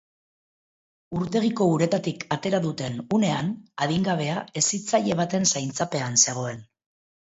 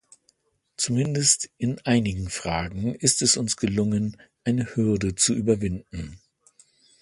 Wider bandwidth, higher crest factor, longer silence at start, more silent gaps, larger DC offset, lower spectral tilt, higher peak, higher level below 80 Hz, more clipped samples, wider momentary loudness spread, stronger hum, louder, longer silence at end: second, 8.2 kHz vs 11.5 kHz; about the same, 20 dB vs 20 dB; first, 1.1 s vs 0.8 s; neither; neither; about the same, -4 dB/octave vs -4 dB/octave; about the same, -6 dBFS vs -4 dBFS; second, -62 dBFS vs -46 dBFS; neither; about the same, 10 LU vs 11 LU; neither; about the same, -24 LUFS vs -24 LUFS; second, 0.65 s vs 0.85 s